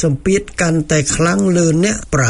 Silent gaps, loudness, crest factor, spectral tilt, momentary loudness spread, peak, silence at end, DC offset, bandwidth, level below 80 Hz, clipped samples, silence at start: none; -15 LUFS; 12 dB; -5 dB/octave; 3 LU; -2 dBFS; 0 s; under 0.1%; 11 kHz; -34 dBFS; under 0.1%; 0 s